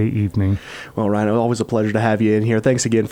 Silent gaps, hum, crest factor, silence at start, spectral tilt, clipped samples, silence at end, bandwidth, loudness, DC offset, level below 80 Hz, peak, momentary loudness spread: none; none; 14 dB; 0 s; -6.5 dB/octave; under 0.1%; 0 s; 13 kHz; -18 LUFS; under 0.1%; -48 dBFS; -4 dBFS; 5 LU